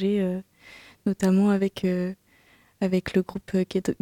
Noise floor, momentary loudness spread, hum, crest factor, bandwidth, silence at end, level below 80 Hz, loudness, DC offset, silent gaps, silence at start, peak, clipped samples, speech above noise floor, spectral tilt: -59 dBFS; 10 LU; none; 16 dB; 13 kHz; 0.1 s; -56 dBFS; -26 LUFS; under 0.1%; none; 0 s; -10 dBFS; under 0.1%; 35 dB; -7.5 dB/octave